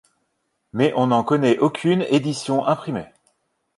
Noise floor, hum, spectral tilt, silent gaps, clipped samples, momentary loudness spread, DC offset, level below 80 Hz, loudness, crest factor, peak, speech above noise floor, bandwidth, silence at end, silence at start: -72 dBFS; none; -6.5 dB/octave; none; under 0.1%; 9 LU; under 0.1%; -62 dBFS; -20 LUFS; 18 dB; -4 dBFS; 53 dB; 11.5 kHz; 0.7 s; 0.75 s